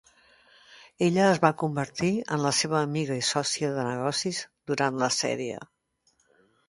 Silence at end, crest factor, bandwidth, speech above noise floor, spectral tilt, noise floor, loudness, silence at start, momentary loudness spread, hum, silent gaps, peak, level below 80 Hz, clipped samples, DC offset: 1.05 s; 24 dB; 11.5 kHz; 44 dB; -4 dB/octave; -70 dBFS; -26 LUFS; 0.7 s; 10 LU; none; none; -4 dBFS; -66 dBFS; under 0.1%; under 0.1%